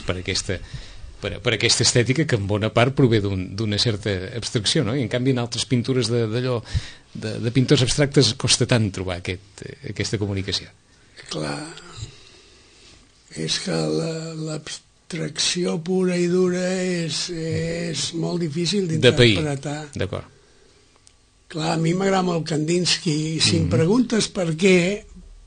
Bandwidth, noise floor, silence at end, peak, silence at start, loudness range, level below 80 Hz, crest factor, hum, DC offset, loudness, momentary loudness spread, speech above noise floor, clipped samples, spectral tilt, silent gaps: 9.6 kHz; -55 dBFS; 0.05 s; 0 dBFS; 0 s; 8 LU; -46 dBFS; 22 dB; none; under 0.1%; -21 LUFS; 14 LU; 34 dB; under 0.1%; -4.5 dB/octave; none